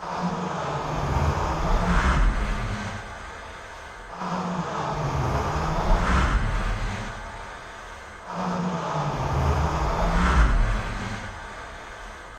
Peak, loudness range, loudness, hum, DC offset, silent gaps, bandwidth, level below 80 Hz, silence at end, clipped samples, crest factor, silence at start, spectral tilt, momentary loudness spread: -8 dBFS; 4 LU; -26 LUFS; none; under 0.1%; none; 9.6 kHz; -28 dBFS; 0 s; under 0.1%; 18 dB; 0 s; -6 dB/octave; 16 LU